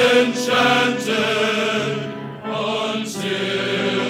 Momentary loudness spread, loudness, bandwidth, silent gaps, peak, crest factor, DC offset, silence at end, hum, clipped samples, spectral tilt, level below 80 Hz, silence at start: 10 LU; -19 LUFS; 16.5 kHz; none; -2 dBFS; 18 dB; under 0.1%; 0 s; none; under 0.1%; -4 dB/octave; -68 dBFS; 0 s